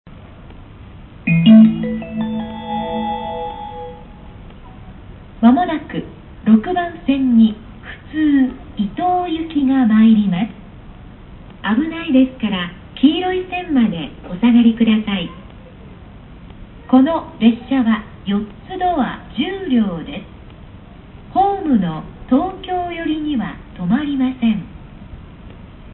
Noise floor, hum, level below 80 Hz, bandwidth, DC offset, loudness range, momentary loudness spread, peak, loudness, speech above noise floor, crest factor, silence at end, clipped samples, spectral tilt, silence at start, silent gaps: -38 dBFS; none; -42 dBFS; 4.1 kHz; under 0.1%; 5 LU; 17 LU; -2 dBFS; -17 LUFS; 22 dB; 16 dB; 0 s; under 0.1%; -12 dB/octave; 0.05 s; none